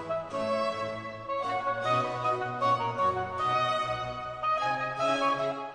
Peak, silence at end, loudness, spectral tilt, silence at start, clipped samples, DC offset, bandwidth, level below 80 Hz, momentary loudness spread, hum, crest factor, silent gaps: -16 dBFS; 0 s; -29 LUFS; -5 dB/octave; 0 s; under 0.1%; under 0.1%; 10 kHz; -62 dBFS; 7 LU; none; 14 dB; none